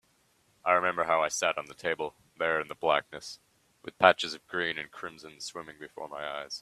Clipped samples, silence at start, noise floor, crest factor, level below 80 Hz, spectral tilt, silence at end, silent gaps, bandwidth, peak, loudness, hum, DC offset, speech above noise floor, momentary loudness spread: under 0.1%; 0.65 s; -69 dBFS; 28 dB; -70 dBFS; -2.5 dB/octave; 0 s; none; 14 kHz; -4 dBFS; -29 LUFS; none; under 0.1%; 38 dB; 19 LU